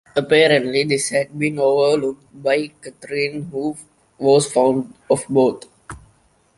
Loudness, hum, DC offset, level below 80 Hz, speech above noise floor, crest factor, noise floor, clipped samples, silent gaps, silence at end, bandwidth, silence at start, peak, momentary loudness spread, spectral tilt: -18 LUFS; none; under 0.1%; -56 dBFS; 39 dB; 18 dB; -57 dBFS; under 0.1%; none; 0.6 s; 11.5 kHz; 0.15 s; -2 dBFS; 18 LU; -4.5 dB/octave